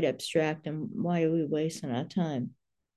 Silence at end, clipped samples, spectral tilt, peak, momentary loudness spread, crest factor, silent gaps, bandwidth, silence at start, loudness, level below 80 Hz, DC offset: 0.5 s; under 0.1%; -6.5 dB/octave; -14 dBFS; 8 LU; 16 dB; none; 12.5 kHz; 0 s; -31 LUFS; -74 dBFS; under 0.1%